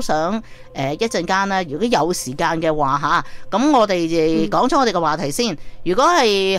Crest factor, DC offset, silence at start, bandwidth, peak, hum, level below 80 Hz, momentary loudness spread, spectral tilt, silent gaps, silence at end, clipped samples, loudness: 14 dB; under 0.1%; 0 s; 16 kHz; -4 dBFS; none; -40 dBFS; 8 LU; -4.5 dB/octave; none; 0 s; under 0.1%; -18 LUFS